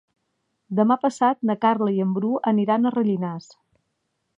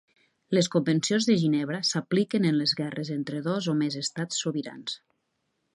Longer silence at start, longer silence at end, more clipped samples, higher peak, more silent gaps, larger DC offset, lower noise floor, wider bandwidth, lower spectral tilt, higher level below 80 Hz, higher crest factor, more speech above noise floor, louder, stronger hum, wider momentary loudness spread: first, 0.7 s vs 0.5 s; first, 1 s vs 0.75 s; neither; first, -6 dBFS vs -10 dBFS; neither; neither; about the same, -75 dBFS vs -77 dBFS; second, 8.2 kHz vs 11.5 kHz; first, -7.5 dB/octave vs -5 dB/octave; about the same, -76 dBFS vs -74 dBFS; about the same, 18 dB vs 18 dB; about the same, 54 dB vs 51 dB; first, -22 LUFS vs -27 LUFS; neither; about the same, 7 LU vs 9 LU